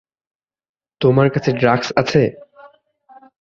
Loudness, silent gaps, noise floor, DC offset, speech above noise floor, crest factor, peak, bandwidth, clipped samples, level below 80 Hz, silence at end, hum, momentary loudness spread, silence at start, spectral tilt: -16 LUFS; none; -49 dBFS; under 0.1%; 34 dB; 18 dB; 0 dBFS; 7.4 kHz; under 0.1%; -54 dBFS; 0.75 s; none; 4 LU; 1 s; -7 dB/octave